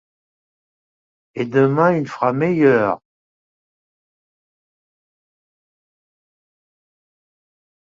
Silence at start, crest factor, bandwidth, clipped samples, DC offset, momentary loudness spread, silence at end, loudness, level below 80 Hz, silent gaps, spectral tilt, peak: 1.35 s; 20 dB; 7.4 kHz; under 0.1%; under 0.1%; 13 LU; 4.95 s; -17 LUFS; -64 dBFS; none; -8.5 dB/octave; -2 dBFS